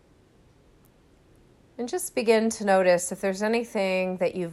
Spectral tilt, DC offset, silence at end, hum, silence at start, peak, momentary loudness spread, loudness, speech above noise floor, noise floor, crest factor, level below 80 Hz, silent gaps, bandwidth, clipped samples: -4.5 dB/octave; under 0.1%; 0 s; none; 1.8 s; -8 dBFS; 8 LU; -25 LUFS; 34 dB; -58 dBFS; 20 dB; -64 dBFS; none; 14 kHz; under 0.1%